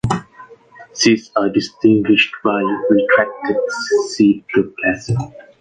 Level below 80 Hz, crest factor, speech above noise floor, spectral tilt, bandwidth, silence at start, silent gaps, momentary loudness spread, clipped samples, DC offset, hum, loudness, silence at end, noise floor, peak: -48 dBFS; 14 dB; 26 dB; -5 dB/octave; 9.4 kHz; 0.05 s; none; 9 LU; under 0.1%; under 0.1%; none; -16 LUFS; 0.2 s; -42 dBFS; -2 dBFS